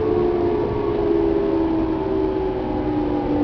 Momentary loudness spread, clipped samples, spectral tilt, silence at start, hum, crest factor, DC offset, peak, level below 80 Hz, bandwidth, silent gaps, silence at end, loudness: 4 LU; under 0.1%; -10 dB/octave; 0 s; none; 12 dB; under 0.1%; -8 dBFS; -34 dBFS; 5.4 kHz; none; 0 s; -21 LUFS